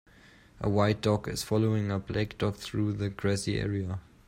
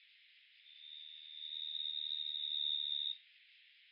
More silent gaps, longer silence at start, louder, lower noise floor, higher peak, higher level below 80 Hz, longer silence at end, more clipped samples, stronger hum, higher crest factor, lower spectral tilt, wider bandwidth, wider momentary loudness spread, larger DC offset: neither; first, 0.55 s vs 0 s; first, -30 LUFS vs -39 LUFS; second, -56 dBFS vs -66 dBFS; first, -12 dBFS vs -28 dBFS; first, -52 dBFS vs under -90 dBFS; first, 0.25 s vs 0 s; neither; neither; about the same, 18 dB vs 16 dB; first, -6 dB/octave vs 11.5 dB/octave; first, 16 kHz vs 5.4 kHz; second, 6 LU vs 16 LU; neither